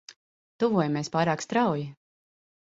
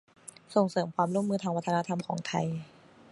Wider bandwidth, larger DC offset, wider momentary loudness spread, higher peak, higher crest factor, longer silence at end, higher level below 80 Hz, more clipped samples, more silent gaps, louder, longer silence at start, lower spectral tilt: second, 8 kHz vs 11.5 kHz; neither; second, 6 LU vs 10 LU; about the same, -10 dBFS vs -10 dBFS; about the same, 18 dB vs 20 dB; first, 0.85 s vs 0.45 s; about the same, -68 dBFS vs -72 dBFS; neither; first, 0.16-0.59 s vs none; first, -27 LUFS vs -31 LUFS; second, 0.1 s vs 0.5 s; about the same, -6 dB/octave vs -6.5 dB/octave